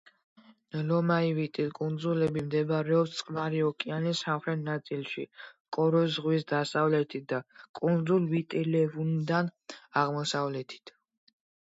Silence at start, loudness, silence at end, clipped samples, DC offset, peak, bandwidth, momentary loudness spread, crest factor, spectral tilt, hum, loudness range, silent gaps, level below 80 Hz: 0.75 s; -30 LUFS; 0.9 s; under 0.1%; under 0.1%; -12 dBFS; 8 kHz; 10 LU; 18 dB; -6.5 dB/octave; none; 2 LU; 5.60-5.65 s, 7.69-7.74 s; -72 dBFS